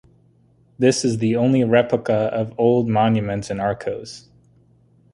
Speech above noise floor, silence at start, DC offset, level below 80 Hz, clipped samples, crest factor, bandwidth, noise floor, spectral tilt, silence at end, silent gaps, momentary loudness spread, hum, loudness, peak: 37 dB; 0.8 s; under 0.1%; -52 dBFS; under 0.1%; 18 dB; 11.5 kHz; -56 dBFS; -6 dB/octave; 0.95 s; none; 11 LU; none; -19 LUFS; -2 dBFS